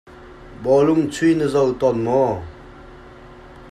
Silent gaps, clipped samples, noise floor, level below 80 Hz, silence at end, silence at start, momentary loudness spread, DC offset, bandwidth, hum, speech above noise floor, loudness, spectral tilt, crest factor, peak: none; under 0.1%; -41 dBFS; -46 dBFS; 0 s; 0.1 s; 12 LU; under 0.1%; 12 kHz; none; 24 dB; -18 LUFS; -7 dB/octave; 14 dB; -6 dBFS